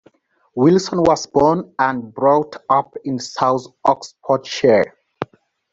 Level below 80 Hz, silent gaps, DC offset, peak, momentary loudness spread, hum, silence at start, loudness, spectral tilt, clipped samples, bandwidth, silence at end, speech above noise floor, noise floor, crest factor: -54 dBFS; none; under 0.1%; -2 dBFS; 11 LU; none; 0.55 s; -18 LUFS; -5.5 dB/octave; under 0.1%; 7.8 kHz; 0.5 s; 38 dB; -55 dBFS; 16 dB